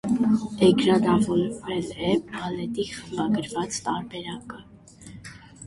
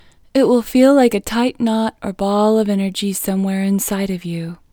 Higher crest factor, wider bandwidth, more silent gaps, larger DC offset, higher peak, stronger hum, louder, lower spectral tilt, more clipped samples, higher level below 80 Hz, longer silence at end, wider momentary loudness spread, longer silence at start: about the same, 20 dB vs 16 dB; second, 11.5 kHz vs over 20 kHz; neither; neither; second, -6 dBFS vs 0 dBFS; neither; second, -25 LUFS vs -17 LUFS; about the same, -5.5 dB/octave vs -5.5 dB/octave; neither; second, -54 dBFS vs -46 dBFS; second, 0 s vs 0.15 s; first, 22 LU vs 10 LU; second, 0.05 s vs 0.35 s